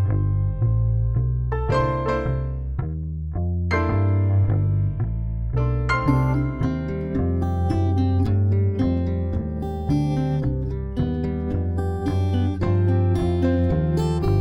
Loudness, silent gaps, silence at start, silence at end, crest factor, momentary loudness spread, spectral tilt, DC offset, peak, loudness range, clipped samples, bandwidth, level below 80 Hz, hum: -23 LUFS; none; 0 s; 0 s; 14 dB; 7 LU; -9 dB/octave; under 0.1%; -6 dBFS; 2 LU; under 0.1%; 8 kHz; -32 dBFS; none